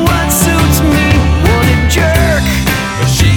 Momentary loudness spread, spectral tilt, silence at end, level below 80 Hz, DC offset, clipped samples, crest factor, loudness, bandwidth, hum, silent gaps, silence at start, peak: 3 LU; -5 dB/octave; 0 s; -16 dBFS; under 0.1%; under 0.1%; 10 dB; -10 LUFS; over 20 kHz; none; none; 0 s; 0 dBFS